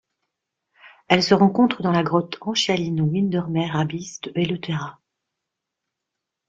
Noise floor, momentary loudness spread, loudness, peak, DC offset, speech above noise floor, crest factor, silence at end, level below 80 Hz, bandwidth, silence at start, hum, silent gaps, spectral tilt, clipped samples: -83 dBFS; 12 LU; -21 LUFS; 0 dBFS; under 0.1%; 62 dB; 22 dB; 1.55 s; -60 dBFS; 7.8 kHz; 0.85 s; none; none; -5.5 dB/octave; under 0.1%